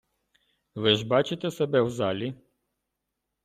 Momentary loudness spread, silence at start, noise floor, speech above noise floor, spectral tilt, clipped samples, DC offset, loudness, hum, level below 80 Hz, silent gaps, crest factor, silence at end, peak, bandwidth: 11 LU; 0.75 s; -83 dBFS; 57 dB; -5.5 dB/octave; under 0.1%; under 0.1%; -26 LUFS; none; -66 dBFS; none; 24 dB; 1.1 s; -6 dBFS; 15 kHz